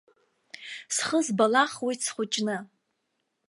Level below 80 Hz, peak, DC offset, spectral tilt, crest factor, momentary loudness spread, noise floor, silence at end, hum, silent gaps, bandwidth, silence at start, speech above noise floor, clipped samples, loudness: -80 dBFS; -8 dBFS; under 0.1%; -2.5 dB/octave; 22 dB; 17 LU; -78 dBFS; 0.85 s; none; none; 11.5 kHz; 0.55 s; 52 dB; under 0.1%; -26 LUFS